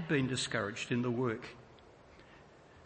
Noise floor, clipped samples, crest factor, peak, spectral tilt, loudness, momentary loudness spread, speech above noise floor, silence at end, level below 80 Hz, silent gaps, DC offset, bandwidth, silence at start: -58 dBFS; under 0.1%; 18 dB; -18 dBFS; -5 dB/octave; -35 LUFS; 20 LU; 24 dB; 0 s; -68 dBFS; none; under 0.1%; 8.4 kHz; 0 s